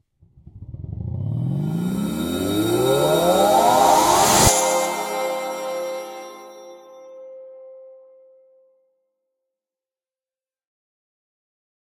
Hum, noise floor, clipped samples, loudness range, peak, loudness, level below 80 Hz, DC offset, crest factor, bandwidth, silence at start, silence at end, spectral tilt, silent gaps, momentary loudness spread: none; under -90 dBFS; under 0.1%; 16 LU; 0 dBFS; -19 LUFS; -46 dBFS; under 0.1%; 22 dB; 16.5 kHz; 0.55 s; 4.05 s; -4 dB/octave; none; 25 LU